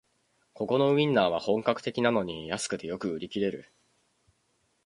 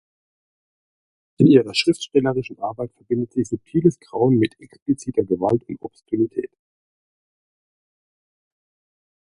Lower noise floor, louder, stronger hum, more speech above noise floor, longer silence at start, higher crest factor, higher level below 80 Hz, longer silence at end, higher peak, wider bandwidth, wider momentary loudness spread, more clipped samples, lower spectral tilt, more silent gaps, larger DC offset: second, -73 dBFS vs under -90 dBFS; second, -28 LUFS vs -21 LUFS; neither; second, 45 dB vs over 70 dB; second, 0.6 s vs 1.4 s; about the same, 22 dB vs 22 dB; second, -64 dBFS vs -58 dBFS; second, 1.25 s vs 2.9 s; second, -8 dBFS vs -2 dBFS; about the same, 11.5 kHz vs 11.5 kHz; second, 10 LU vs 15 LU; neither; second, -5 dB/octave vs -6.5 dB/octave; second, none vs 4.82-4.86 s; neither